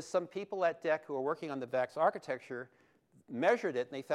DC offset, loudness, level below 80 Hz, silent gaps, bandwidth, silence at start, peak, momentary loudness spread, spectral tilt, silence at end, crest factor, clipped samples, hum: under 0.1%; -35 LUFS; -86 dBFS; none; 12 kHz; 0 s; -16 dBFS; 12 LU; -5.5 dB/octave; 0 s; 18 dB; under 0.1%; none